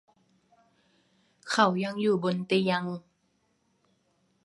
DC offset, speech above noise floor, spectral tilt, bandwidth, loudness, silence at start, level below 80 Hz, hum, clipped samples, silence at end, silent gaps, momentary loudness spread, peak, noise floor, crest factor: under 0.1%; 46 dB; -5.5 dB/octave; 11.5 kHz; -27 LUFS; 1.45 s; -74 dBFS; none; under 0.1%; 1.45 s; none; 14 LU; -8 dBFS; -72 dBFS; 24 dB